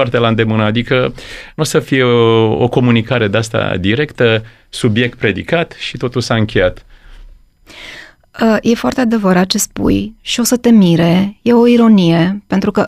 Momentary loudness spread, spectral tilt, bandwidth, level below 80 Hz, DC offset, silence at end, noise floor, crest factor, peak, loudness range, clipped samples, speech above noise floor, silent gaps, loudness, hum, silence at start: 10 LU; -5.5 dB/octave; 15.5 kHz; -38 dBFS; under 0.1%; 0 s; -38 dBFS; 12 dB; 0 dBFS; 6 LU; under 0.1%; 26 dB; none; -13 LUFS; none; 0 s